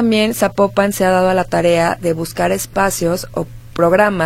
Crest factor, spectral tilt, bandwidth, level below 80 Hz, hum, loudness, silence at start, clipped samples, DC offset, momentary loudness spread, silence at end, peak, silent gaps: 14 dB; -5 dB/octave; 16.5 kHz; -38 dBFS; none; -15 LUFS; 0 s; under 0.1%; under 0.1%; 7 LU; 0 s; 0 dBFS; none